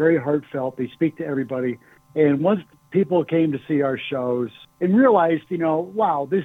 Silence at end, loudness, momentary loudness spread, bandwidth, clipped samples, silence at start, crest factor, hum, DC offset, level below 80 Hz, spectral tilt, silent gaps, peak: 0 s; -22 LUFS; 10 LU; 4 kHz; under 0.1%; 0 s; 16 dB; none; under 0.1%; -70 dBFS; -9 dB/octave; none; -4 dBFS